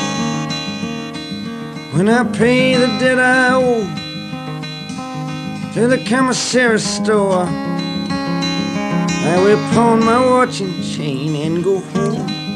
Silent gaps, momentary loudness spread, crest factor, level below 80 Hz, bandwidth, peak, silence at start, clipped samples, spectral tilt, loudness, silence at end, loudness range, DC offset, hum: none; 13 LU; 16 dB; -48 dBFS; 12.5 kHz; 0 dBFS; 0 s; under 0.1%; -5 dB/octave; -16 LUFS; 0 s; 2 LU; under 0.1%; none